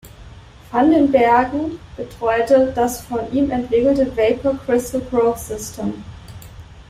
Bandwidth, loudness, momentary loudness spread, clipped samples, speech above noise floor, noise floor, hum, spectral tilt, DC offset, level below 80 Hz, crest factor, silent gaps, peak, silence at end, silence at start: 16 kHz; -18 LUFS; 18 LU; under 0.1%; 23 dB; -40 dBFS; none; -5.5 dB/octave; under 0.1%; -42 dBFS; 16 dB; none; -2 dBFS; 0.05 s; 0.05 s